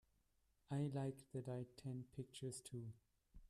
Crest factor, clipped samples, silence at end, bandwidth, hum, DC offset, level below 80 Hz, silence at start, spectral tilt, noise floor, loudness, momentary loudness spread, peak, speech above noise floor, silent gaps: 18 dB; under 0.1%; 0.05 s; 13.5 kHz; none; under 0.1%; -74 dBFS; 0.7 s; -6.5 dB/octave; -81 dBFS; -50 LUFS; 9 LU; -34 dBFS; 33 dB; none